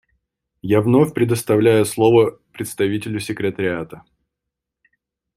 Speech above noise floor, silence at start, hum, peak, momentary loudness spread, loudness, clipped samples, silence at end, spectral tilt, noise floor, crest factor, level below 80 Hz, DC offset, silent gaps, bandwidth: 65 dB; 0.65 s; none; -2 dBFS; 14 LU; -18 LUFS; under 0.1%; 1.4 s; -6 dB/octave; -82 dBFS; 18 dB; -56 dBFS; under 0.1%; none; 16 kHz